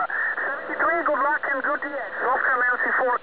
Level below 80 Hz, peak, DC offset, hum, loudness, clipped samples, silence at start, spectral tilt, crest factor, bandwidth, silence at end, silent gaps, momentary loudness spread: -66 dBFS; -12 dBFS; 0.3%; none; -23 LUFS; under 0.1%; 0 s; -6.5 dB/octave; 12 dB; 4 kHz; 0 s; none; 6 LU